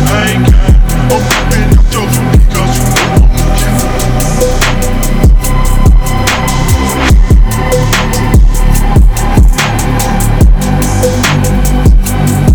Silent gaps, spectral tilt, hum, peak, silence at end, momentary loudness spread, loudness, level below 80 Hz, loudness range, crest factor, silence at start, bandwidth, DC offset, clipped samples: none; -5 dB/octave; none; 0 dBFS; 0 s; 3 LU; -9 LUFS; -8 dBFS; 1 LU; 6 dB; 0 s; over 20 kHz; under 0.1%; 2%